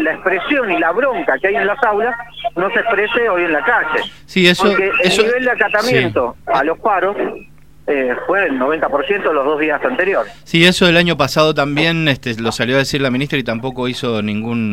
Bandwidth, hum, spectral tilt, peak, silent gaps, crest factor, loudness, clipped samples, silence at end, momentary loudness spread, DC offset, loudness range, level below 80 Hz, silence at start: 16.5 kHz; none; -5 dB/octave; 0 dBFS; none; 16 dB; -15 LUFS; under 0.1%; 0 s; 8 LU; 0.8%; 3 LU; -46 dBFS; 0 s